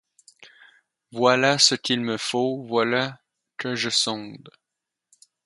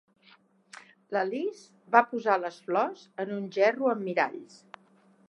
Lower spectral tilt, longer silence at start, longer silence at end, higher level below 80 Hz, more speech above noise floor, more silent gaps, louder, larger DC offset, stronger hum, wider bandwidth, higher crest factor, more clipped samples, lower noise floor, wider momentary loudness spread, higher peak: second, -2.5 dB/octave vs -5.5 dB/octave; second, 0.4 s vs 0.75 s; about the same, 0.95 s vs 0.85 s; first, -72 dBFS vs -90 dBFS; first, 62 dB vs 34 dB; neither; first, -22 LUFS vs -28 LUFS; neither; neither; about the same, 11.5 kHz vs 11 kHz; about the same, 24 dB vs 26 dB; neither; first, -85 dBFS vs -62 dBFS; first, 16 LU vs 12 LU; about the same, -2 dBFS vs -4 dBFS